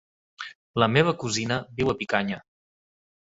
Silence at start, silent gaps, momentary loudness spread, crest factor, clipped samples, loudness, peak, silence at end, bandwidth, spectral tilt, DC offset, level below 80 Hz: 0.4 s; 0.55-0.74 s; 18 LU; 24 dB; under 0.1%; -25 LUFS; -2 dBFS; 0.95 s; 8 kHz; -5 dB/octave; under 0.1%; -56 dBFS